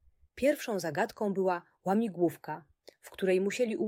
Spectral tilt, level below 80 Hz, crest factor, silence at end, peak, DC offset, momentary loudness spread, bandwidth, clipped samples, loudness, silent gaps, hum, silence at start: -5.5 dB/octave; -68 dBFS; 16 dB; 0 s; -16 dBFS; under 0.1%; 13 LU; 16.5 kHz; under 0.1%; -31 LUFS; none; none; 0.35 s